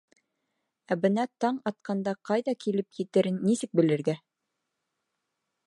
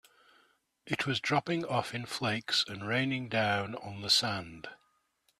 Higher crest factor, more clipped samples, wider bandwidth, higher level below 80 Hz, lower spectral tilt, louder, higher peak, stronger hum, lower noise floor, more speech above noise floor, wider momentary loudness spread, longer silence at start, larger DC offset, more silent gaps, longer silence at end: about the same, 20 dB vs 22 dB; neither; second, 11.5 kHz vs 14 kHz; second, -78 dBFS vs -68 dBFS; first, -6.5 dB/octave vs -3.5 dB/octave; first, -28 LUFS vs -31 LUFS; about the same, -10 dBFS vs -12 dBFS; neither; first, -83 dBFS vs -74 dBFS; first, 56 dB vs 42 dB; second, 7 LU vs 13 LU; about the same, 0.9 s vs 0.85 s; neither; neither; first, 1.5 s vs 0.65 s